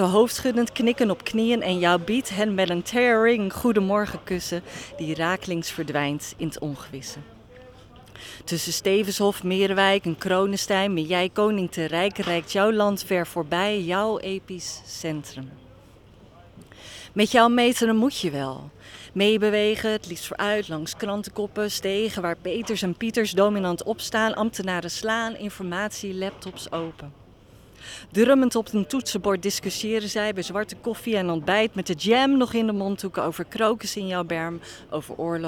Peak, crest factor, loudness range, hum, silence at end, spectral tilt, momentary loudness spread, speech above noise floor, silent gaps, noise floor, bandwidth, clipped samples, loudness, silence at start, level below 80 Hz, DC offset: -4 dBFS; 20 dB; 7 LU; none; 0 s; -4.5 dB/octave; 13 LU; 26 dB; none; -50 dBFS; 19 kHz; under 0.1%; -24 LUFS; 0 s; -56 dBFS; under 0.1%